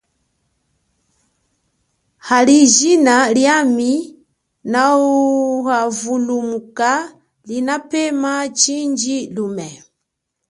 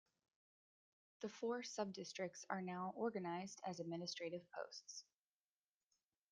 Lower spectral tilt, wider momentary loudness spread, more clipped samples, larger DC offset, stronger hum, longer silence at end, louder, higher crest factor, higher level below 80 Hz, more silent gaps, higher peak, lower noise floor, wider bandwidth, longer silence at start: second, -2.5 dB/octave vs -4.5 dB/octave; first, 14 LU vs 8 LU; neither; neither; neither; second, 0.75 s vs 1.3 s; first, -15 LUFS vs -48 LUFS; second, 16 dB vs 22 dB; first, -64 dBFS vs under -90 dBFS; neither; first, 0 dBFS vs -28 dBFS; second, -76 dBFS vs under -90 dBFS; first, 11.5 kHz vs 10 kHz; first, 2.25 s vs 1.2 s